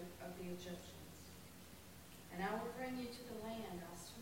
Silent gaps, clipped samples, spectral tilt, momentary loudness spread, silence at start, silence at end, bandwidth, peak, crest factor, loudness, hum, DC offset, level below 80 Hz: none; under 0.1%; -4.5 dB/octave; 14 LU; 0 s; 0 s; 16 kHz; -30 dBFS; 18 dB; -49 LUFS; none; under 0.1%; -68 dBFS